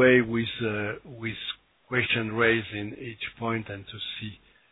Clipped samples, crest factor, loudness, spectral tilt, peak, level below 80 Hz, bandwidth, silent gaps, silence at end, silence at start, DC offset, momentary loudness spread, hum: under 0.1%; 20 dB; -28 LUFS; -9 dB/octave; -6 dBFS; -58 dBFS; 4.1 kHz; none; 0.35 s; 0 s; under 0.1%; 14 LU; none